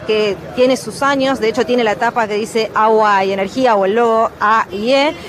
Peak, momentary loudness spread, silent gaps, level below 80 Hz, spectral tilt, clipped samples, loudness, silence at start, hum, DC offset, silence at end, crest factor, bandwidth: -2 dBFS; 5 LU; none; -50 dBFS; -4 dB/octave; under 0.1%; -14 LUFS; 0 s; none; under 0.1%; 0 s; 12 dB; 14 kHz